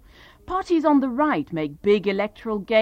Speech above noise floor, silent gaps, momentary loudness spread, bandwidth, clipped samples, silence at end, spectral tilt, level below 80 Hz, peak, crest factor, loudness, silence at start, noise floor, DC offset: 25 dB; none; 10 LU; 8.8 kHz; under 0.1%; 0 s; -7 dB/octave; -52 dBFS; -8 dBFS; 16 dB; -22 LUFS; 0.5 s; -46 dBFS; under 0.1%